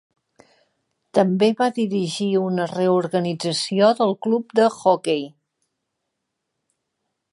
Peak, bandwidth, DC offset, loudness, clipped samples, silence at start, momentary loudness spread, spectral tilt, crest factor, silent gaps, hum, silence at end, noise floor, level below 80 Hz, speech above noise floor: -2 dBFS; 11.5 kHz; under 0.1%; -20 LUFS; under 0.1%; 1.15 s; 6 LU; -5.5 dB/octave; 20 dB; none; none; 2.05 s; -79 dBFS; -74 dBFS; 59 dB